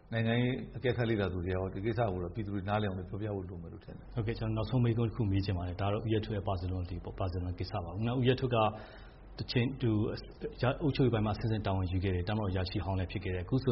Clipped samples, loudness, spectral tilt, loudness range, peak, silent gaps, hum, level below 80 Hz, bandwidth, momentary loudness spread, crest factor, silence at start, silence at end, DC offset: under 0.1%; -34 LUFS; -6.5 dB/octave; 2 LU; -16 dBFS; none; none; -50 dBFS; 5.8 kHz; 10 LU; 16 dB; 0.05 s; 0 s; under 0.1%